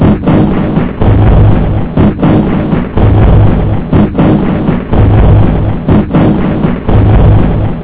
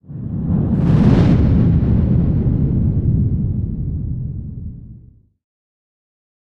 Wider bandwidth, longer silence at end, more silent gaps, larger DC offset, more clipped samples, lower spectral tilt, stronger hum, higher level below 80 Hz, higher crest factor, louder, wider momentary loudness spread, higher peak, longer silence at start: second, 4 kHz vs 6 kHz; second, 0 s vs 1.65 s; neither; neither; first, 4% vs under 0.1%; first, -12.5 dB/octave vs -10.5 dB/octave; neither; first, -14 dBFS vs -26 dBFS; second, 6 dB vs 16 dB; first, -8 LUFS vs -16 LUFS; second, 5 LU vs 15 LU; about the same, 0 dBFS vs -2 dBFS; about the same, 0 s vs 0.1 s